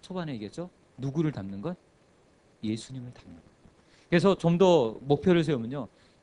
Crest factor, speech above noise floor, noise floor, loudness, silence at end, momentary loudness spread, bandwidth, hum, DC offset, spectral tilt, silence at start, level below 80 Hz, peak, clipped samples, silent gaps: 20 dB; 35 dB; -62 dBFS; -27 LUFS; 0.35 s; 20 LU; 10.5 kHz; none; under 0.1%; -7 dB/octave; 0.05 s; -60 dBFS; -8 dBFS; under 0.1%; none